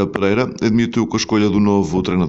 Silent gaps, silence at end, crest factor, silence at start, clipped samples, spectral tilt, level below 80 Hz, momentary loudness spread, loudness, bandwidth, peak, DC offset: none; 0 s; 16 dB; 0 s; under 0.1%; -6 dB/octave; -42 dBFS; 3 LU; -17 LUFS; 8 kHz; 0 dBFS; under 0.1%